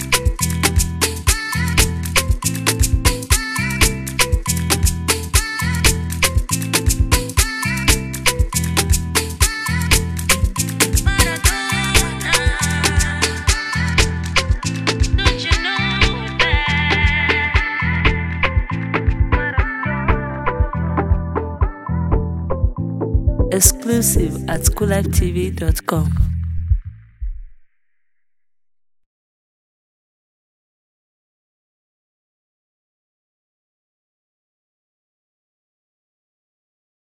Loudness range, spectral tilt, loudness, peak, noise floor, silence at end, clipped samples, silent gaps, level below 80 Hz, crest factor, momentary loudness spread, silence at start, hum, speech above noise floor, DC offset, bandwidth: 4 LU; -3.5 dB/octave; -17 LUFS; 0 dBFS; -83 dBFS; 9.5 s; under 0.1%; none; -24 dBFS; 18 dB; 6 LU; 0 s; none; 67 dB; under 0.1%; 16 kHz